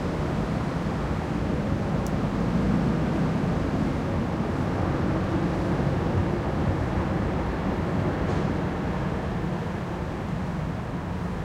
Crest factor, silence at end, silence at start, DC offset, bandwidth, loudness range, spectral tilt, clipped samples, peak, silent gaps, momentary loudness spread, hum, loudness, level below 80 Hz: 14 dB; 0 s; 0 s; under 0.1%; 12.5 kHz; 2 LU; -8 dB/octave; under 0.1%; -12 dBFS; none; 5 LU; none; -27 LUFS; -36 dBFS